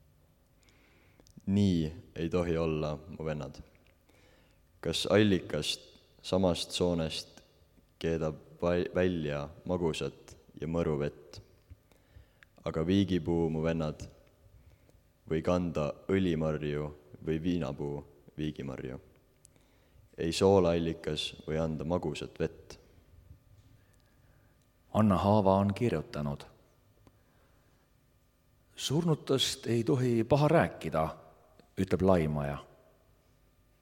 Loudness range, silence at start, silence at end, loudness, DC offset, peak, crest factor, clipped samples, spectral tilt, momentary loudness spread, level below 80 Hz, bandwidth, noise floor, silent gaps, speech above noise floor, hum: 7 LU; 1.45 s; 1.15 s; -31 LUFS; under 0.1%; -10 dBFS; 24 dB; under 0.1%; -6 dB/octave; 16 LU; -54 dBFS; 17 kHz; -68 dBFS; none; 37 dB; none